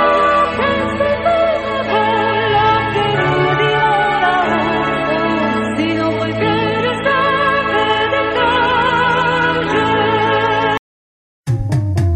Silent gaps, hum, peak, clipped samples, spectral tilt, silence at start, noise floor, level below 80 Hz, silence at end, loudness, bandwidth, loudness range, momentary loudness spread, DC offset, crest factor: 10.79-11.43 s; none; -2 dBFS; under 0.1%; -6 dB/octave; 0 s; under -90 dBFS; -38 dBFS; 0 s; -15 LUFS; 11.5 kHz; 2 LU; 4 LU; under 0.1%; 14 dB